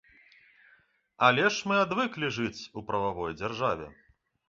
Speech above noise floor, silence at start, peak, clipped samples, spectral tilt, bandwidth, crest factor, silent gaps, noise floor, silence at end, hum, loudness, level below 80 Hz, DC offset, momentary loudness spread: 36 dB; 1.2 s; -6 dBFS; under 0.1%; -4.5 dB/octave; 7.6 kHz; 24 dB; none; -65 dBFS; 0.55 s; none; -28 LUFS; -60 dBFS; under 0.1%; 12 LU